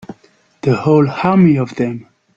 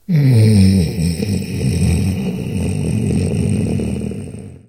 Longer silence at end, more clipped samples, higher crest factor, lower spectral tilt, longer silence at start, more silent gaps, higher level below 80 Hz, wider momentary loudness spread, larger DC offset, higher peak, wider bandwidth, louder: first, 0.35 s vs 0.1 s; neither; about the same, 14 dB vs 14 dB; first, -9 dB/octave vs -7 dB/octave; about the same, 0.1 s vs 0.1 s; neither; second, -52 dBFS vs -32 dBFS; about the same, 10 LU vs 11 LU; second, under 0.1% vs 0.3%; about the same, 0 dBFS vs 0 dBFS; second, 7.4 kHz vs 16 kHz; about the same, -14 LUFS vs -16 LUFS